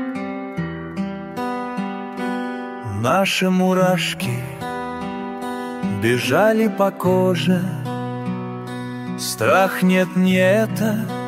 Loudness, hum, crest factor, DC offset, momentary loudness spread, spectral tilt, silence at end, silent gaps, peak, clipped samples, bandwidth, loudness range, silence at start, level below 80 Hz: -20 LUFS; none; 18 dB; under 0.1%; 12 LU; -5.5 dB/octave; 0 s; none; -2 dBFS; under 0.1%; 16 kHz; 2 LU; 0 s; -56 dBFS